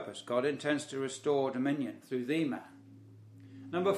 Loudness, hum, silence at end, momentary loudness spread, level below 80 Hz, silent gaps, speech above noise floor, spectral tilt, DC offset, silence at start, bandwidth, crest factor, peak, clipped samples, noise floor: -34 LUFS; none; 0 s; 11 LU; -82 dBFS; none; 22 dB; -5.5 dB/octave; under 0.1%; 0 s; 14.5 kHz; 18 dB; -16 dBFS; under 0.1%; -55 dBFS